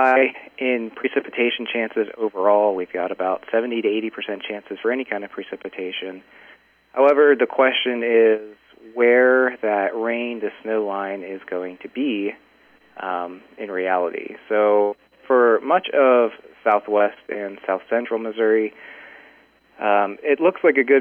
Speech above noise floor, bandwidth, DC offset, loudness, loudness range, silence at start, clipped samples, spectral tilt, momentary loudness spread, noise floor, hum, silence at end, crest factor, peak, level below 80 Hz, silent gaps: 35 dB; 4.2 kHz; under 0.1%; -20 LUFS; 9 LU; 0 s; under 0.1%; -6.5 dB/octave; 14 LU; -55 dBFS; none; 0 s; 16 dB; -4 dBFS; -74 dBFS; none